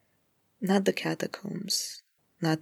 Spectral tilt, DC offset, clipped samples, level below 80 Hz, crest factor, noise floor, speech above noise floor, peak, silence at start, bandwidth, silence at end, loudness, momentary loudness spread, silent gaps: -4 dB/octave; under 0.1%; under 0.1%; -82 dBFS; 20 dB; -72 dBFS; 42 dB; -12 dBFS; 0.6 s; 17.5 kHz; 0 s; -30 LUFS; 11 LU; none